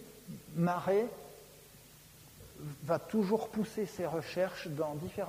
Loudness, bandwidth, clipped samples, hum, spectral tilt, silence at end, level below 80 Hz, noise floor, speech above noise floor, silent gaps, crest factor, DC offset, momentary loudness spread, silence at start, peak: -35 LUFS; 15.5 kHz; under 0.1%; none; -6.5 dB/octave; 0 s; -66 dBFS; -57 dBFS; 23 dB; none; 20 dB; under 0.1%; 23 LU; 0 s; -16 dBFS